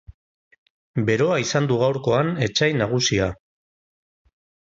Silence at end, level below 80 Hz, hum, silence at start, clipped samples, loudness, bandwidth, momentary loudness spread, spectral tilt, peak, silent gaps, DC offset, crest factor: 1.3 s; -48 dBFS; none; 0.1 s; under 0.1%; -21 LUFS; 7.8 kHz; 5 LU; -5 dB/octave; -6 dBFS; 0.14-0.51 s, 0.58-0.94 s; under 0.1%; 18 dB